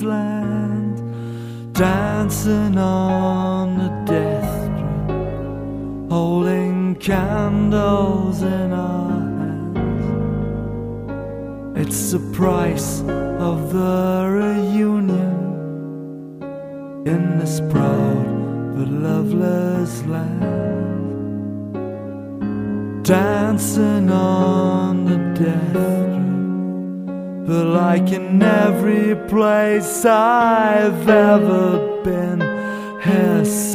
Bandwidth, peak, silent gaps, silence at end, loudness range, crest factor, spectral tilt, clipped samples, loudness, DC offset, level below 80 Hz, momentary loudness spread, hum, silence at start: 15.5 kHz; 0 dBFS; none; 0 s; 7 LU; 18 dB; -6.5 dB/octave; under 0.1%; -19 LUFS; under 0.1%; -40 dBFS; 12 LU; none; 0 s